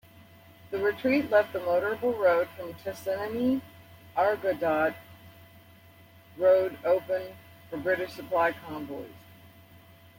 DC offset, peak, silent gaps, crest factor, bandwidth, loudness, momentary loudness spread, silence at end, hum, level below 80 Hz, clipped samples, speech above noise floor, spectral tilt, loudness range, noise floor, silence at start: under 0.1%; -10 dBFS; none; 18 dB; 16.5 kHz; -28 LUFS; 14 LU; 1 s; none; -68 dBFS; under 0.1%; 27 dB; -6 dB/octave; 3 LU; -54 dBFS; 0.65 s